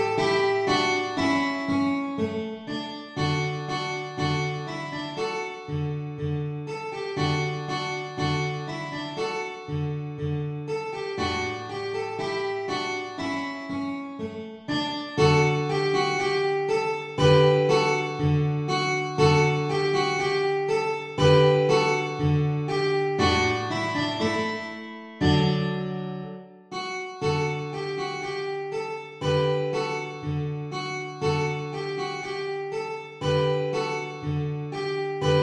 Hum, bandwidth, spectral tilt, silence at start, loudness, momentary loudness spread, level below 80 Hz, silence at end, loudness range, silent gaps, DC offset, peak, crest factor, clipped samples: none; 9.8 kHz; -5.5 dB/octave; 0 s; -26 LUFS; 11 LU; -52 dBFS; 0 s; 8 LU; none; under 0.1%; -6 dBFS; 20 dB; under 0.1%